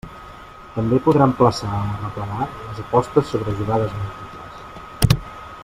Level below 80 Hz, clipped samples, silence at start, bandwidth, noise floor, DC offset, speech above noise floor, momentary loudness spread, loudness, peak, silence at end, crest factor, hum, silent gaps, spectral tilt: -38 dBFS; under 0.1%; 0.05 s; 16 kHz; -39 dBFS; under 0.1%; 20 dB; 21 LU; -20 LUFS; 0 dBFS; 0 s; 20 dB; none; none; -7 dB/octave